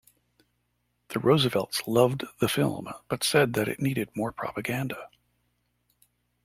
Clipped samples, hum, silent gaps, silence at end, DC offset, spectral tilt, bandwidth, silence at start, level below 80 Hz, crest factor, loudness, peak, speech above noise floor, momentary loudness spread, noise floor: under 0.1%; 60 Hz at -55 dBFS; none; 1.4 s; under 0.1%; -5 dB/octave; 16.5 kHz; 1.1 s; -62 dBFS; 22 dB; -27 LUFS; -6 dBFS; 48 dB; 11 LU; -75 dBFS